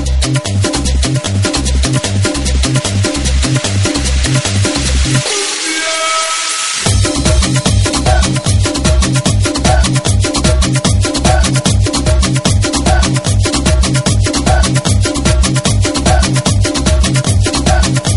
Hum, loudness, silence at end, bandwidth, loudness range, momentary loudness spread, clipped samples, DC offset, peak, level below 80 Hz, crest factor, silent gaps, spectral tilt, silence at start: none; -12 LUFS; 0 s; 11.5 kHz; 1 LU; 2 LU; under 0.1%; 0.3%; 0 dBFS; -16 dBFS; 12 dB; none; -4 dB/octave; 0 s